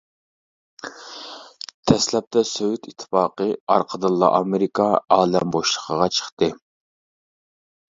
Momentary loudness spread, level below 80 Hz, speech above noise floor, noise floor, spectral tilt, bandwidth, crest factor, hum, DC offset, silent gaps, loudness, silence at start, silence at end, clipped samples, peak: 18 LU; -56 dBFS; over 70 dB; under -90 dBFS; -4.5 dB/octave; 8 kHz; 22 dB; none; under 0.1%; 1.74-1.83 s, 2.27-2.31 s, 3.60-3.67 s, 6.32-6.37 s; -20 LUFS; 0.85 s; 1.4 s; under 0.1%; 0 dBFS